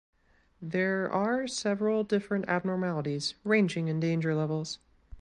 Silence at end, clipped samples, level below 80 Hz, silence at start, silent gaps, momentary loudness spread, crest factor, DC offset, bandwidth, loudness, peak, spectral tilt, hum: 0 s; under 0.1%; -62 dBFS; 0.6 s; none; 7 LU; 16 dB; under 0.1%; 11 kHz; -30 LUFS; -14 dBFS; -5.5 dB/octave; none